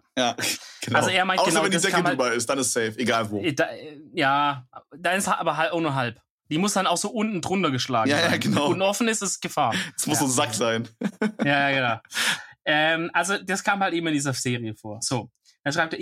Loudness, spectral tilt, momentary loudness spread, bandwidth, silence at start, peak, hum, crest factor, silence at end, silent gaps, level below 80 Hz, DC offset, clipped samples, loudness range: -23 LUFS; -3.5 dB/octave; 7 LU; 16.5 kHz; 0.15 s; -6 dBFS; none; 18 dB; 0 s; 6.30-6.38 s; -68 dBFS; under 0.1%; under 0.1%; 2 LU